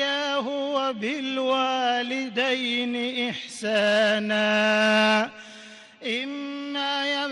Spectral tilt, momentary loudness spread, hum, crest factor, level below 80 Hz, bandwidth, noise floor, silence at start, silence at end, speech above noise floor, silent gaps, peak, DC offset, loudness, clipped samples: -3.5 dB/octave; 11 LU; none; 12 dB; -74 dBFS; 11.5 kHz; -46 dBFS; 0 s; 0 s; 22 dB; none; -12 dBFS; under 0.1%; -24 LUFS; under 0.1%